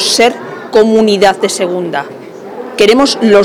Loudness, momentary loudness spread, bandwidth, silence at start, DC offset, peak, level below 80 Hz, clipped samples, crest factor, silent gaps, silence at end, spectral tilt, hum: -10 LUFS; 18 LU; 16 kHz; 0 s; under 0.1%; 0 dBFS; -48 dBFS; under 0.1%; 10 dB; none; 0 s; -3.5 dB/octave; none